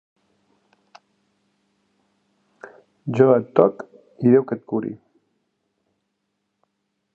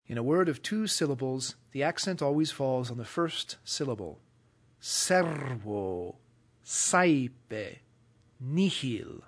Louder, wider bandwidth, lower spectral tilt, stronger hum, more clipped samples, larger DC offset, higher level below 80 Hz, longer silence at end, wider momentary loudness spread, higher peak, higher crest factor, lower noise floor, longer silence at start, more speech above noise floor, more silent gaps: first, -19 LUFS vs -30 LUFS; second, 6.8 kHz vs 11 kHz; first, -10 dB/octave vs -4 dB/octave; neither; neither; neither; about the same, -70 dBFS vs -70 dBFS; first, 2.2 s vs 0.05 s; first, 22 LU vs 13 LU; first, 0 dBFS vs -10 dBFS; about the same, 24 dB vs 20 dB; first, -75 dBFS vs -64 dBFS; first, 3.05 s vs 0.1 s; first, 57 dB vs 34 dB; neither